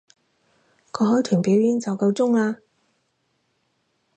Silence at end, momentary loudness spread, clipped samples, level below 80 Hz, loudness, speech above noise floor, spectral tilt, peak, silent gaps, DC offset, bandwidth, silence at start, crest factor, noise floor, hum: 1.6 s; 9 LU; under 0.1%; -72 dBFS; -21 LUFS; 51 dB; -7 dB/octave; -8 dBFS; none; under 0.1%; 8.8 kHz; 0.95 s; 16 dB; -70 dBFS; none